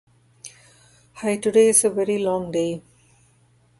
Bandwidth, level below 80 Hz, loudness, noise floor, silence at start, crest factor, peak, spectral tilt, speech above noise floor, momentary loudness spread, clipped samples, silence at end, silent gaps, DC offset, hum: 12 kHz; -62 dBFS; -20 LUFS; -59 dBFS; 0.45 s; 20 dB; -4 dBFS; -4 dB/octave; 39 dB; 27 LU; under 0.1%; 1 s; none; under 0.1%; none